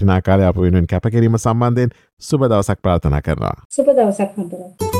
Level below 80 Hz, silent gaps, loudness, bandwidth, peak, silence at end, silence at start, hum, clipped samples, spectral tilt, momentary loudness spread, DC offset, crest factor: -34 dBFS; 2.13-2.17 s, 3.65-3.70 s; -16 LUFS; 15 kHz; -2 dBFS; 0 s; 0 s; none; under 0.1%; -7.5 dB/octave; 8 LU; under 0.1%; 14 dB